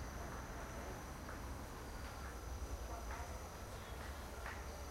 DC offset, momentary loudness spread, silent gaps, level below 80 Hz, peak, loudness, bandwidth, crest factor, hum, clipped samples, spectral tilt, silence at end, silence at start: under 0.1%; 2 LU; none; -52 dBFS; -32 dBFS; -49 LUFS; 16 kHz; 16 dB; none; under 0.1%; -4.5 dB/octave; 0 s; 0 s